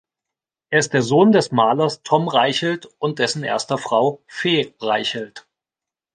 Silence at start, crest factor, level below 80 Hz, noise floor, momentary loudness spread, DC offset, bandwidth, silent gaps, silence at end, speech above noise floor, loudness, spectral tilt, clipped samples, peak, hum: 0.7 s; 18 dB; -66 dBFS; -89 dBFS; 10 LU; under 0.1%; 10 kHz; none; 0.75 s; 70 dB; -19 LUFS; -4.5 dB/octave; under 0.1%; -2 dBFS; none